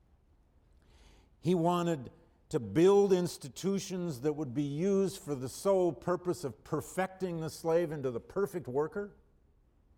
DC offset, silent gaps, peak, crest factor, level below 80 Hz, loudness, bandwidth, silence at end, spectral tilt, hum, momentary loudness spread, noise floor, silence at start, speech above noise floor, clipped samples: under 0.1%; none; -16 dBFS; 16 dB; -64 dBFS; -32 LUFS; 16.5 kHz; 0.9 s; -6.5 dB/octave; none; 11 LU; -67 dBFS; 1.45 s; 35 dB; under 0.1%